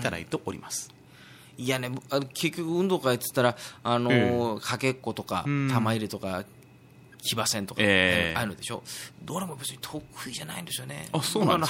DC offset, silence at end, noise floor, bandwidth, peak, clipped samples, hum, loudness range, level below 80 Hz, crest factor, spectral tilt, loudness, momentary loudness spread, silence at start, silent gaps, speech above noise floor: under 0.1%; 0 s; -53 dBFS; 16.5 kHz; -6 dBFS; under 0.1%; none; 4 LU; -60 dBFS; 22 dB; -4.5 dB/octave; -28 LUFS; 13 LU; 0 s; none; 25 dB